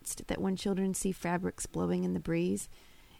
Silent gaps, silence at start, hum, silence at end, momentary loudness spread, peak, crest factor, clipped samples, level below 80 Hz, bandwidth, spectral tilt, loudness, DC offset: none; 0.05 s; none; 0 s; 5 LU; -18 dBFS; 16 dB; under 0.1%; -54 dBFS; 16 kHz; -5.5 dB/octave; -34 LUFS; under 0.1%